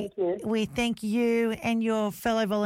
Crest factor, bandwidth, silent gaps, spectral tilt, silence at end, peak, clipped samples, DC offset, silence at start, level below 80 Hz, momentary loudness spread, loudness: 10 dB; 16.5 kHz; none; -5.5 dB/octave; 0 s; -16 dBFS; under 0.1%; under 0.1%; 0 s; -56 dBFS; 3 LU; -27 LUFS